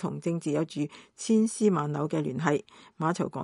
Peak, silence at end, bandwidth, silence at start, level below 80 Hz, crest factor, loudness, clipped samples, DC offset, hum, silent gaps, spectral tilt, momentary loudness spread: -8 dBFS; 0 s; 11.5 kHz; 0 s; -70 dBFS; 20 dB; -29 LUFS; under 0.1%; under 0.1%; none; none; -6 dB/octave; 8 LU